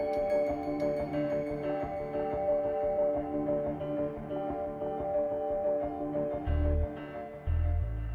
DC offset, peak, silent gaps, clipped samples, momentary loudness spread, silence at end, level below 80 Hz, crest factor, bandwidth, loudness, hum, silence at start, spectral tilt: under 0.1%; -20 dBFS; none; under 0.1%; 6 LU; 0 s; -40 dBFS; 12 dB; 7 kHz; -33 LUFS; none; 0 s; -9.5 dB/octave